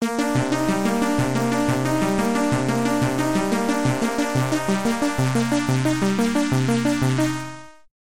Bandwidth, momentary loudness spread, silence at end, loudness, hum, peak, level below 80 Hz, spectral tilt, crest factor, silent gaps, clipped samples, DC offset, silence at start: 16.5 kHz; 2 LU; 0.15 s; -21 LUFS; none; -8 dBFS; -48 dBFS; -5.5 dB/octave; 14 dB; none; under 0.1%; 1%; 0 s